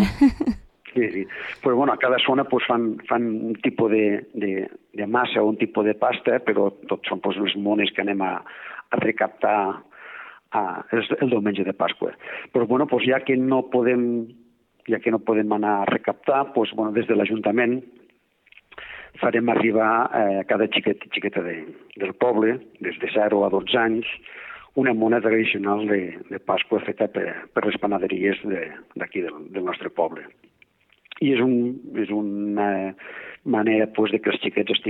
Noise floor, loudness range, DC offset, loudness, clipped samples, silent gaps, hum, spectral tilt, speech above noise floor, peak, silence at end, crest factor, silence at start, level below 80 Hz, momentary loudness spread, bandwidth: -60 dBFS; 3 LU; under 0.1%; -23 LUFS; under 0.1%; none; none; -7.5 dB/octave; 37 dB; -6 dBFS; 0 s; 18 dB; 0 s; -54 dBFS; 12 LU; 7.4 kHz